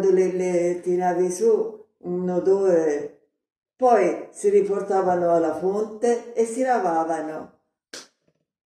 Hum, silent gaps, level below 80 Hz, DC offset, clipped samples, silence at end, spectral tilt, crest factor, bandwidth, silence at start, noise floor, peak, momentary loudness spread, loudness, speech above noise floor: none; 3.58-3.62 s; -72 dBFS; under 0.1%; under 0.1%; 0.6 s; -6 dB/octave; 18 dB; 12 kHz; 0 s; -71 dBFS; -4 dBFS; 13 LU; -22 LUFS; 50 dB